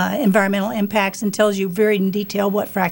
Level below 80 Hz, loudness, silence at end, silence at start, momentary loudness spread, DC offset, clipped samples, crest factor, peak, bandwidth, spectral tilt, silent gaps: -60 dBFS; -19 LUFS; 0 s; 0 s; 4 LU; under 0.1%; under 0.1%; 16 dB; -4 dBFS; 16.5 kHz; -5.5 dB/octave; none